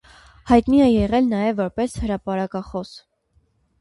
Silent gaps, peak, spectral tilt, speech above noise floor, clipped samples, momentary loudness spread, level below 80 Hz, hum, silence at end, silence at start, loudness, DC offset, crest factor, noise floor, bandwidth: none; -2 dBFS; -7 dB/octave; 44 dB; under 0.1%; 14 LU; -40 dBFS; none; 0.85 s; 0.45 s; -20 LUFS; under 0.1%; 18 dB; -63 dBFS; 11.5 kHz